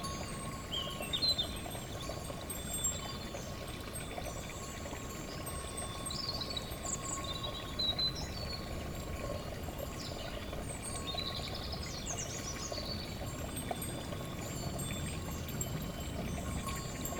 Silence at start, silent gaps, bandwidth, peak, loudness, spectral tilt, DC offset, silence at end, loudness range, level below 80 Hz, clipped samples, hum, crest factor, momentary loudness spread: 0 s; none; over 20 kHz; -22 dBFS; -39 LUFS; -3 dB/octave; under 0.1%; 0 s; 4 LU; -48 dBFS; under 0.1%; none; 18 dB; 8 LU